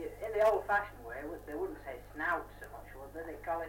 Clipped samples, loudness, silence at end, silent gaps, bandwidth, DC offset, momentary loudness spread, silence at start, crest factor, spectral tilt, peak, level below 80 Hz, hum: under 0.1%; -36 LUFS; 0 s; none; 17 kHz; under 0.1%; 18 LU; 0 s; 18 dB; -5.5 dB/octave; -18 dBFS; -56 dBFS; 50 Hz at -55 dBFS